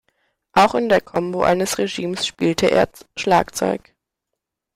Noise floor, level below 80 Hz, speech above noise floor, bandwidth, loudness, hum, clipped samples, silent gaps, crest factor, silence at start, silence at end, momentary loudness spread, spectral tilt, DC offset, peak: -81 dBFS; -50 dBFS; 62 dB; 16 kHz; -19 LUFS; none; under 0.1%; none; 16 dB; 0.55 s; 1 s; 8 LU; -4 dB/octave; under 0.1%; -4 dBFS